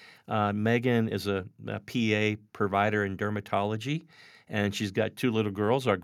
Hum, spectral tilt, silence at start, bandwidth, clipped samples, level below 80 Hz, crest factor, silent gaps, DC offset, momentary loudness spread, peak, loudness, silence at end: none; -6 dB/octave; 0 s; 15.5 kHz; under 0.1%; -74 dBFS; 18 dB; none; under 0.1%; 8 LU; -10 dBFS; -29 LUFS; 0 s